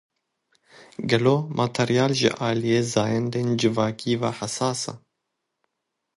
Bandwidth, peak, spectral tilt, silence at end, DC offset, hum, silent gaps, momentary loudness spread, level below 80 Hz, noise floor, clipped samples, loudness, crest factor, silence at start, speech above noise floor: 11.5 kHz; -4 dBFS; -5 dB/octave; 1.2 s; under 0.1%; none; none; 7 LU; -62 dBFS; -80 dBFS; under 0.1%; -23 LUFS; 20 dB; 0.8 s; 58 dB